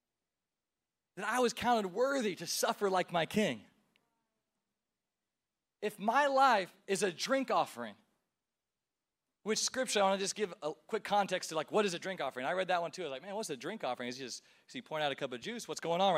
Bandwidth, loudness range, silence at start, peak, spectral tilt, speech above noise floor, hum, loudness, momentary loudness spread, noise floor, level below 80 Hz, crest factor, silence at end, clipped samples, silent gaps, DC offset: 16 kHz; 5 LU; 1.15 s; -16 dBFS; -3 dB/octave; over 56 dB; none; -34 LUFS; 11 LU; under -90 dBFS; -78 dBFS; 20 dB; 0 s; under 0.1%; none; under 0.1%